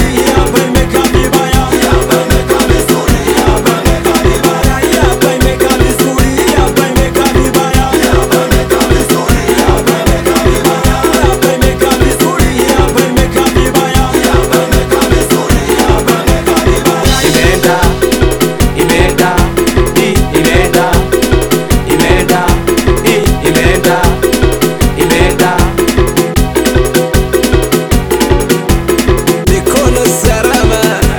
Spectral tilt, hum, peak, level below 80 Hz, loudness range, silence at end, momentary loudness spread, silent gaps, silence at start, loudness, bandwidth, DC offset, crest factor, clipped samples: -4.5 dB/octave; none; 0 dBFS; -16 dBFS; 1 LU; 0 s; 2 LU; none; 0 s; -9 LUFS; over 20 kHz; under 0.1%; 8 dB; 0.9%